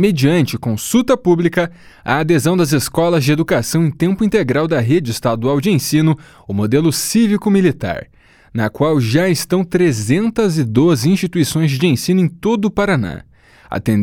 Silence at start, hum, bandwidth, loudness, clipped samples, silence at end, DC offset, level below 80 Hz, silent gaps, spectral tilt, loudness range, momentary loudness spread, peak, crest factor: 0 s; none; 18 kHz; -15 LUFS; under 0.1%; 0 s; under 0.1%; -44 dBFS; none; -6 dB/octave; 1 LU; 8 LU; 0 dBFS; 14 dB